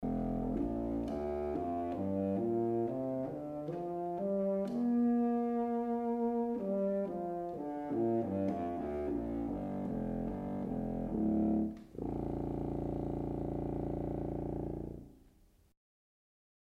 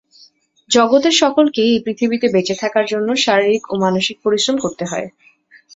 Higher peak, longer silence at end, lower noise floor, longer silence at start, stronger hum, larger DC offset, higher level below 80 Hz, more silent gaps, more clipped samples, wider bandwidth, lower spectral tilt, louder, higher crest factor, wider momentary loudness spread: second, -24 dBFS vs -2 dBFS; first, 1.6 s vs 0.65 s; first, -65 dBFS vs -51 dBFS; second, 0 s vs 0.7 s; neither; neither; first, -52 dBFS vs -58 dBFS; neither; neither; second, 5.6 kHz vs 8 kHz; first, -10.5 dB/octave vs -3.5 dB/octave; second, -36 LUFS vs -16 LUFS; about the same, 12 dB vs 16 dB; about the same, 7 LU vs 9 LU